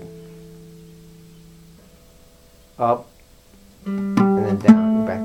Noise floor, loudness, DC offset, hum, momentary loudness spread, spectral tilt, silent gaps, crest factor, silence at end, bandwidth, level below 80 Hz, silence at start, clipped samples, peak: -50 dBFS; -18 LUFS; under 0.1%; none; 27 LU; -8.5 dB/octave; none; 22 dB; 0 s; 9.6 kHz; -54 dBFS; 0 s; under 0.1%; 0 dBFS